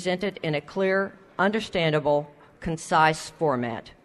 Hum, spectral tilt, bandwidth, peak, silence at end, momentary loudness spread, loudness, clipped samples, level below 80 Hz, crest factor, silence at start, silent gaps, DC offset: none; -5 dB/octave; 12.5 kHz; -6 dBFS; 0.15 s; 12 LU; -25 LUFS; under 0.1%; -54 dBFS; 18 dB; 0 s; none; under 0.1%